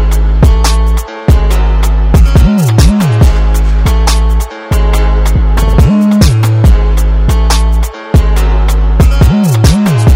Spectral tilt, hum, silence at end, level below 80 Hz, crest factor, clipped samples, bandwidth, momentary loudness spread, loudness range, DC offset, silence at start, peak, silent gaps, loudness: -6.5 dB/octave; none; 0 s; -8 dBFS; 6 dB; 0.8%; 16 kHz; 4 LU; 1 LU; under 0.1%; 0 s; 0 dBFS; none; -9 LUFS